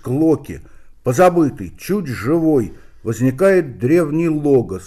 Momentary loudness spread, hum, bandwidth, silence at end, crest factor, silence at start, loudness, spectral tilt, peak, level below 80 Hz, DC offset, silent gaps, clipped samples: 15 LU; none; 15 kHz; 0 s; 14 dB; 0.05 s; -17 LUFS; -7.5 dB/octave; -4 dBFS; -44 dBFS; under 0.1%; none; under 0.1%